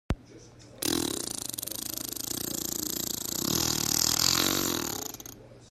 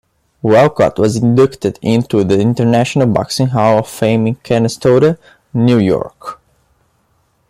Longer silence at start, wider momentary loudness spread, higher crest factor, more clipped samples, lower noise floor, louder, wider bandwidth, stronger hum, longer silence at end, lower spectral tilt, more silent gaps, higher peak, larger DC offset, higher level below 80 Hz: second, 0.1 s vs 0.45 s; first, 13 LU vs 8 LU; first, 26 dB vs 12 dB; neither; second, -51 dBFS vs -59 dBFS; second, -28 LUFS vs -13 LUFS; about the same, 16 kHz vs 15.5 kHz; neither; second, 0 s vs 1.15 s; second, -2 dB/octave vs -7 dB/octave; neither; second, -6 dBFS vs 0 dBFS; neither; about the same, -50 dBFS vs -46 dBFS